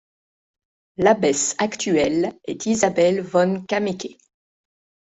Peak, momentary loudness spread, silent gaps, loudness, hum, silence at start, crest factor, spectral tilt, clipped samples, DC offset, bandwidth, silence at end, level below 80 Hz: -4 dBFS; 10 LU; none; -20 LUFS; none; 1 s; 18 dB; -4 dB/octave; under 0.1%; under 0.1%; 8.2 kHz; 0.95 s; -58 dBFS